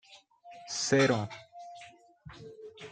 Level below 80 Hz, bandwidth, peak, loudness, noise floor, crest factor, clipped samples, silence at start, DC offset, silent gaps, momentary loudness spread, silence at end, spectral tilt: -68 dBFS; 9.4 kHz; -12 dBFS; -29 LUFS; -56 dBFS; 22 dB; under 0.1%; 0.1 s; under 0.1%; none; 26 LU; 0 s; -4 dB/octave